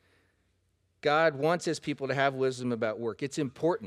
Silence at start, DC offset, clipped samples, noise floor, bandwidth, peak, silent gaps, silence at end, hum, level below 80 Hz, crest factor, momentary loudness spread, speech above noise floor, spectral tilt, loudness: 1.05 s; under 0.1%; under 0.1%; -73 dBFS; 13 kHz; -12 dBFS; none; 0 s; none; -72 dBFS; 20 dB; 8 LU; 44 dB; -5 dB/octave; -30 LUFS